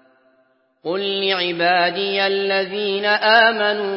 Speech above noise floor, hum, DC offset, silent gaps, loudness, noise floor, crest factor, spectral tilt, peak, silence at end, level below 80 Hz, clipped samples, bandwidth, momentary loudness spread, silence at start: 43 dB; none; under 0.1%; none; -17 LUFS; -61 dBFS; 18 dB; -8 dB/octave; 0 dBFS; 0 s; -74 dBFS; under 0.1%; 5.8 kHz; 9 LU; 0.85 s